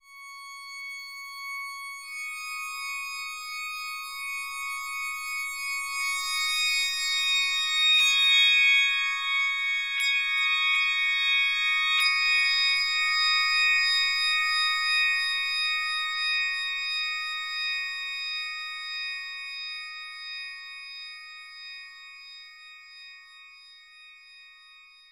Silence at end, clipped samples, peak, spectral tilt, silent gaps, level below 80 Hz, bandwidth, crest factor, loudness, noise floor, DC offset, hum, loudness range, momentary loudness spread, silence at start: 0.3 s; under 0.1%; -10 dBFS; 7.5 dB/octave; none; -66 dBFS; 16 kHz; 18 dB; -24 LUFS; -53 dBFS; under 0.1%; none; 17 LU; 19 LU; 0.1 s